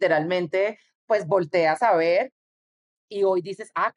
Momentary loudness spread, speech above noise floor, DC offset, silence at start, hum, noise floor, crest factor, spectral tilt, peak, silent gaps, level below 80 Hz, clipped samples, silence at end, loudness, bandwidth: 8 LU; over 67 dB; under 0.1%; 0 s; none; under -90 dBFS; 16 dB; -6 dB/octave; -8 dBFS; 0.95-1.08 s, 2.32-3.08 s; -76 dBFS; under 0.1%; 0.05 s; -23 LUFS; 11 kHz